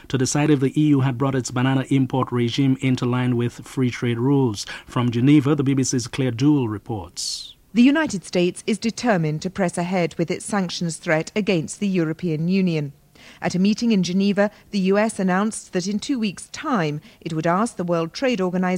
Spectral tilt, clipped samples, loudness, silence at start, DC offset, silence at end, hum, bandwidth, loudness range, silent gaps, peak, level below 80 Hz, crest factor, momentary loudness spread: -6 dB/octave; under 0.1%; -21 LUFS; 0.1 s; under 0.1%; 0 s; none; 15 kHz; 3 LU; none; -6 dBFS; -54 dBFS; 16 dB; 8 LU